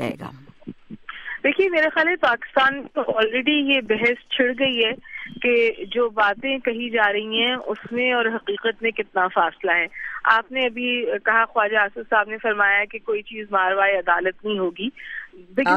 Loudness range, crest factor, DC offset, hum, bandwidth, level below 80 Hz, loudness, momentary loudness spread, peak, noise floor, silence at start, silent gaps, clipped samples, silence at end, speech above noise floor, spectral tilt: 2 LU; 20 dB; under 0.1%; none; 8.2 kHz; -60 dBFS; -21 LUFS; 10 LU; -2 dBFS; -41 dBFS; 0 s; none; under 0.1%; 0 s; 19 dB; -5 dB/octave